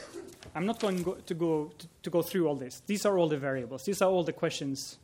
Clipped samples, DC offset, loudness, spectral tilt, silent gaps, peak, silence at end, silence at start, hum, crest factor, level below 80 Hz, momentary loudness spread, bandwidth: under 0.1%; under 0.1%; -31 LUFS; -5.5 dB/octave; none; -12 dBFS; 0.1 s; 0 s; none; 18 dB; -68 dBFS; 12 LU; 17 kHz